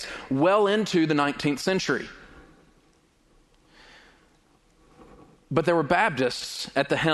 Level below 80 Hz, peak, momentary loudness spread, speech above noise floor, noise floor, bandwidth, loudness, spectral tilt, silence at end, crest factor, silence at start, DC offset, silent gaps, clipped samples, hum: -58 dBFS; -6 dBFS; 8 LU; 39 dB; -62 dBFS; 12 kHz; -24 LUFS; -5 dB/octave; 0 s; 20 dB; 0 s; under 0.1%; none; under 0.1%; none